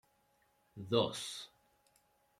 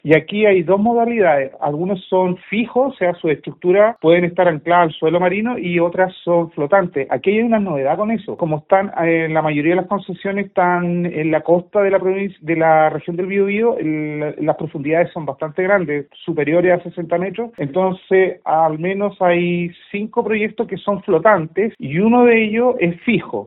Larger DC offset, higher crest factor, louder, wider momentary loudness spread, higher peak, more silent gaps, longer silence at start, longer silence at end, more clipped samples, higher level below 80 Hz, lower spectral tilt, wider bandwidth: neither; first, 24 dB vs 16 dB; second, -36 LUFS vs -17 LUFS; first, 19 LU vs 8 LU; second, -16 dBFS vs 0 dBFS; neither; first, 0.75 s vs 0.05 s; first, 0.95 s vs 0 s; neither; second, -76 dBFS vs -58 dBFS; about the same, -4.5 dB/octave vs -5.5 dB/octave; first, 15 kHz vs 4.1 kHz